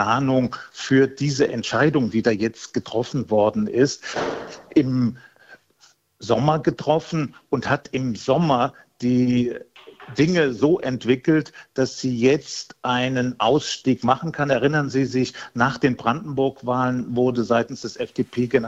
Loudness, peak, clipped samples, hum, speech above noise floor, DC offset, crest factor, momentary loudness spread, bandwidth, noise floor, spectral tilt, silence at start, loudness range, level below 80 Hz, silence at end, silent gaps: -22 LUFS; -2 dBFS; under 0.1%; none; 37 dB; under 0.1%; 20 dB; 8 LU; 8 kHz; -58 dBFS; -6 dB/octave; 0 s; 2 LU; -56 dBFS; 0 s; none